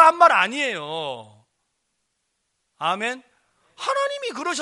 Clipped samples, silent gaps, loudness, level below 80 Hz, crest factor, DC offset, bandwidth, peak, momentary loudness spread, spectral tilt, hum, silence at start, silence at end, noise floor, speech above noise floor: under 0.1%; none; -22 LUFS; -74 dBFS; 22 dB; under 0.1%; 11.5 kHz; -2 dBFS; 16 LU; -2.5 dB/octave; none; 0 s; 0 s; -75 dBFS; 52 dB